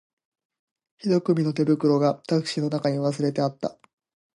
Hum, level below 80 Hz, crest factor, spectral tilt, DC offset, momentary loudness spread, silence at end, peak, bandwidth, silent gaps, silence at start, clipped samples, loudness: none; -72 dBFS; 16 dB; -7 dB/octave; under 0.1%; 7 LU; 0.65 s; -8 dBFS; 11.5 kHz; none; 1.05 s; under 0.1%; -24 LUFS